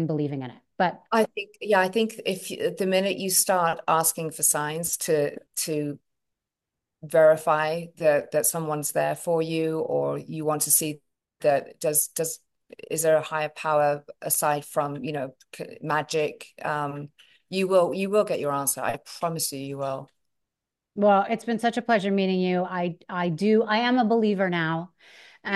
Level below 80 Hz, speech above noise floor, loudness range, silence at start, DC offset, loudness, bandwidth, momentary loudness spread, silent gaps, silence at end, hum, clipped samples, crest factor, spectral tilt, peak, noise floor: -72 dBFS; 62 dB; 3 LU; 0 s; under 0.1%; -25 LUFS; 13 kHz; 11 LU; none; 0 s; none; under 0.1%; 18 dB; -4 dB/octave; -6 dBFS; -86 dBFS